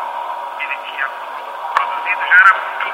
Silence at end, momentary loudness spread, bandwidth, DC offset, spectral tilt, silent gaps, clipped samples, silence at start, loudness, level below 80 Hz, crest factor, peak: 0 s; 17 LU; 16.5 kHz; under 0.1%; 0 dB/octave; none; under 0.1%; 0 s; -15 LUFS; -76 dBFS; 18 dB; 0 dBFS